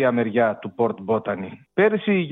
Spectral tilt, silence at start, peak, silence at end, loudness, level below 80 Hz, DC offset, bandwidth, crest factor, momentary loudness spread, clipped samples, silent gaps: -9.5 dB/octave; 0 s; -6 dBFS; 0 s; -22 LUFS; -66 dBFS; under 0.1%; 4 kHz; 16 dB; 9 LU; under 0.1%; none